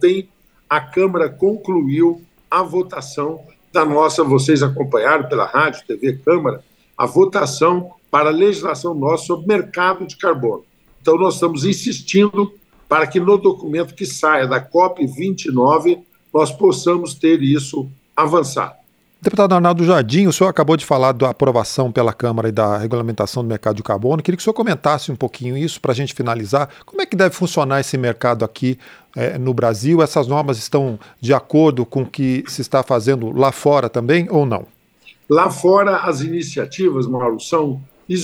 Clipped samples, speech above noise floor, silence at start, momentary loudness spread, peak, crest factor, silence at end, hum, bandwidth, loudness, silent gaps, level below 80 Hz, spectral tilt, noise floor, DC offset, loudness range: under 0.1%; 33 dB; 0 s; 9 LU; -2 dBFS; 16 dB; 0 s; none; 15.5 kHz; -17 LUFS; none; -58 dBFS; -6 dB/octave; -49 dBFS; under 0.1%; 3 LU